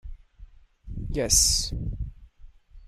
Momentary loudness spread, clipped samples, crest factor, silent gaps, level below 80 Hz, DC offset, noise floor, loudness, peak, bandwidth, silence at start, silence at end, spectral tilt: 21 LU; under 0.1%; 22 dB; none; -36 dBFS; under 0.1%; -49 dBFS; -23 LUFS; -8 dBFS; 16 kHz; 0.05 s; 0 s; -2 dB/octave